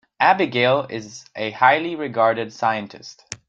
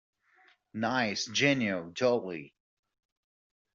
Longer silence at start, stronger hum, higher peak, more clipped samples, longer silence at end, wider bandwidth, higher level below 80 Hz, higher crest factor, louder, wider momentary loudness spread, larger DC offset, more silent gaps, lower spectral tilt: second, 0.2 s vs 0.75 s; neither; first, -2 dBFS vs -12 dBFS; neither; second, 0.15 s vs 1.25 s; first, 9.2 kHz vs 7.8 kHz; first, -64 dBFS vs -74 dBFS; about the same, 20 dB vs 22 dB; first, -19 LUFS vs -29 LUFS; first, 19 LU vs 15 LU; neither; neither; first, -4.5 dB/octave vs -3 dB/octave